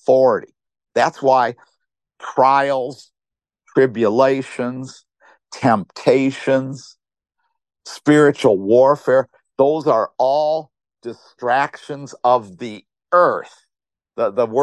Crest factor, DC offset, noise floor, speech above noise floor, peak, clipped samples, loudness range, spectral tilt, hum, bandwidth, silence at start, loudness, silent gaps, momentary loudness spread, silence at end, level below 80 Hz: 18 dB; under 0.1%; -88 dBFS; 71 dB; 0 dBFS; under 0.1%; 4 LU; -6 dB/octave; none; 10.5 kHz; 0.1 s; -17 LUFS; none; 18 LU; 0 s; -66 dBFS